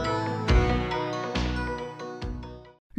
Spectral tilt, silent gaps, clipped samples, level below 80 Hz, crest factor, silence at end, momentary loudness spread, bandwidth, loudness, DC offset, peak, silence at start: -6.5 dB/octave; 2.79-2.90 s; under 0.1%; -32 dBFS; 18 dB; 0 s; 15 LU; 8.8 kHz; -28 LUFS; under 0.1%; -10 dBFS; 0 s